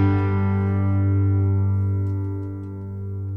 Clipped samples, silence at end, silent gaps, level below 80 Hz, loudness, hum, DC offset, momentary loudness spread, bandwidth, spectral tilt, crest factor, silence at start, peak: under 0.1%; 0 s; none; -50 dBFS; -23 LUFS; 50 Hz at -55 dBFS; under 0.1%; 12 LU; 3.3 kHz; -11.5 dB/octave; 12 dB; 0 s; -10 dBFS